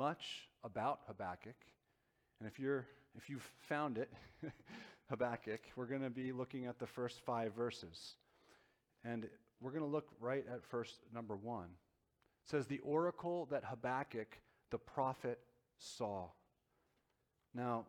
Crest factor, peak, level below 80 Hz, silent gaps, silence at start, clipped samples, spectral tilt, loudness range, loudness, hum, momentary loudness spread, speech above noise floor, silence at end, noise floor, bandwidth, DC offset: 20 dB; -26 dBFS; -78 dBFS; none; 0 s; under 0.1%; -6 dB/octave; 4 LU; -45 LUFS; none; 14 LU; 39 dB; 0 s; -84 dBFS; 18 kHz; under 0.1%